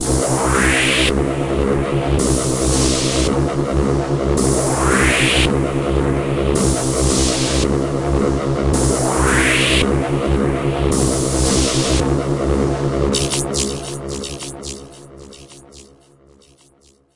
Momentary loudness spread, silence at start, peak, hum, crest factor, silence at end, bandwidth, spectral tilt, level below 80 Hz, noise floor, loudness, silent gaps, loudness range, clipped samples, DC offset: 6 LU; 0 s; -2 dBFS; none; 14 dB; 1.3 s; 11.5 kHz; -4.5 dB/octave; -26 dBFS; -53 dBFS; -17 LUFS; none; 6 LU; under 0.1%; 0.8%